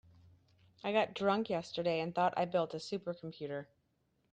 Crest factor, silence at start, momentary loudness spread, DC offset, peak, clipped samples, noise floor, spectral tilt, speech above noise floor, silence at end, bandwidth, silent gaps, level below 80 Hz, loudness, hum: 20 dB; 0.85 s; 11 LU; under 0.1%; -18 dBFS; under 0.1%; -78 dBFS; -6 dB/octave; 42 dB; 0.7 s; 9.4 kHz; none; -76 dBFS; -36 LUFS; none